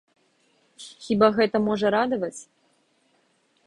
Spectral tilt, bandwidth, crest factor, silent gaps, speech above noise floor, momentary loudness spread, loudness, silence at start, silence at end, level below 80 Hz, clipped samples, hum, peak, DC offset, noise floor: -5.5 dB/octave; 11 kHz; 20 dB; none; 44 dB; 24 LU; -23 LUFS; 0.8 s; 1.25 s; -62 dBFS; under 0.1%; none; -6 dBFS; under 0.1%; -66 dBFS